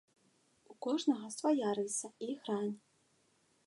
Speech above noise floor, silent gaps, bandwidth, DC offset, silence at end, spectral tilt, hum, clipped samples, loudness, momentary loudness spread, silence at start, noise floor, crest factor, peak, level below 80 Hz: 38 dB; none; 11.5 kHz; under 0.1%; 0.9 s; -4 dB/octave; none; under 0.1%; -37 LUFS; 9 LU; 0.7 s; -74 dBFS; 18 dB; -20 dBFS; under -90 dBFS